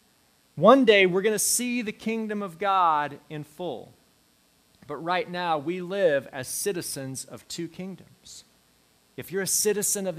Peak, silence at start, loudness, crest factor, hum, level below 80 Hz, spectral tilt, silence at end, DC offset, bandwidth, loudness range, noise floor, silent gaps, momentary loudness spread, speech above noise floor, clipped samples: -2 dBFS; 0.55 s; -24 LUFS; 24 dB; none; -70 dBFS; -3 dB/octave; 0 s; under 0.1%; 16 kHz; 9 LU; -63 dBFS; none; 21 LU; 38 dB; under 0.1%